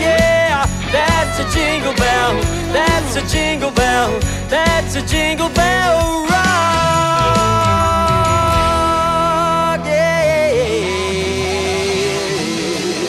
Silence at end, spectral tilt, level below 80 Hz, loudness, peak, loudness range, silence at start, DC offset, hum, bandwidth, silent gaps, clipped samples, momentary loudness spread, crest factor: 0 s; -4 dB/octave; -28 dBFS; -15 LUFS; -2 dBFS; 2 LU; 0 s; under 0.1%; none; 15.5 kHz; none; under 0.1%; 5 LU; 14 dB